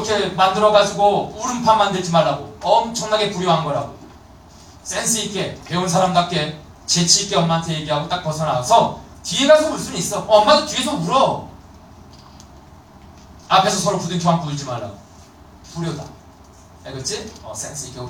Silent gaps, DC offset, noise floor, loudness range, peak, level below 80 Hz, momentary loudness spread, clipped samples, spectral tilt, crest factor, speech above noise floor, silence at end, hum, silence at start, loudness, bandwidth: none; under 0.1%; -44 dBFS; 5 LU; 0 dBFS; -48 dBFS; 15 LU; under 0.1%; -3.5 dB/octave; 18 dB; 26 dB; 0 s; none; 0 s; -18 LUFS; 17 kHz